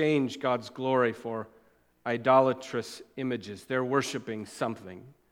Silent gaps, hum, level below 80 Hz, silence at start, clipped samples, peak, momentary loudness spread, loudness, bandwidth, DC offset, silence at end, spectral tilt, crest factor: none; none; -74 dBFS; 0 s; under 0.1%; -10 dBFS; 17 LU; -29 LUFS; 16 kHz; under 0.1%; 0.2 s; -5.5 dB/octave; 20 dB